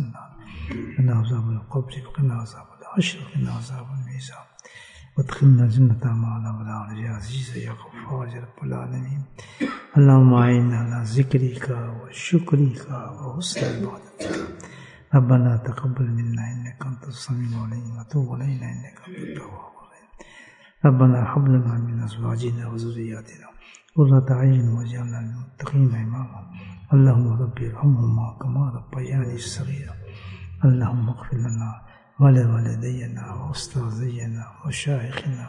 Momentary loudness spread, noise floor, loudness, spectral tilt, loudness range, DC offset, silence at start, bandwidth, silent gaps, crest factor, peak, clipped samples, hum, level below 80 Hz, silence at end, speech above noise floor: 18 LU; -49 dBFS; -22 LUFS; -7.5 dB/octave; 9 LU; under 0.1%; 0 s; 10.5 kHz; none; 18 dB; -4 dBFS; under 0.1%; none; -52 dBFS; 0 s; 28 dB